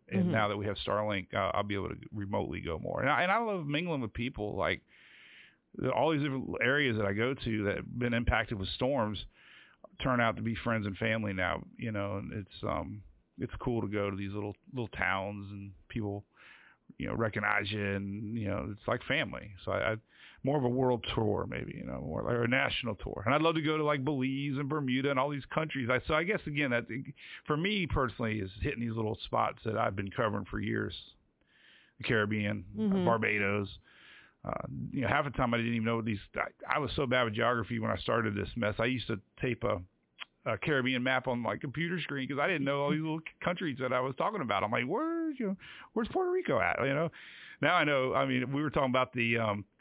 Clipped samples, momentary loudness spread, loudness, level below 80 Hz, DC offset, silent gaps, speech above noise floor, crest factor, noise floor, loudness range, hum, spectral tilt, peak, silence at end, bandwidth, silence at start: under 0.1%; 10 LU; -32 LUFS; -52 dBFS; under 0.1%; none; 36 dB; 22 dB; -68 dBFS; 4 LU; none; -4.5 dB/octave; -12 dBFS; 0.2 s; 4 kHz; 0.1 s